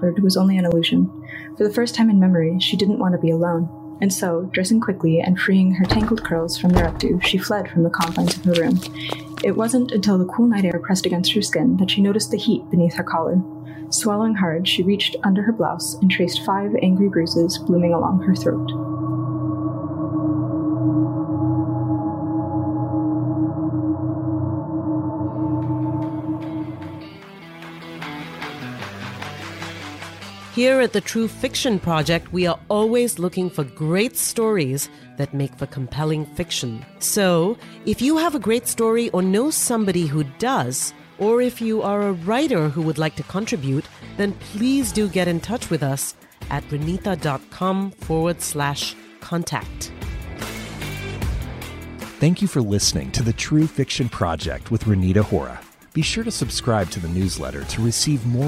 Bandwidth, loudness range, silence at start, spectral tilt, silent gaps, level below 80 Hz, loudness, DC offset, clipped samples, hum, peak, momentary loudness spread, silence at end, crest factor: 16 kHz; 7 LU; 0 s; -5 dB/octave; none; -42 dBFS; -21 LUFS; under 0.1%; under 0.1%; none; -2 dBFS; 13 LU; 0 s; 18 dB